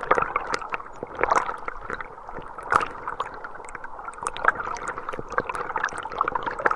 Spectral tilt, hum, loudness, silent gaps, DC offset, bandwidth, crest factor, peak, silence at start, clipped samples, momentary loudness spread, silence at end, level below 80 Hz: -3.5 dB/octave; none; -28 LUFS; none; under 0.1%; 11.5 kHz; 26 dB; 0 dBFS; 0 s; under 0.1%; 14 LU; 0 s; -48 dBFS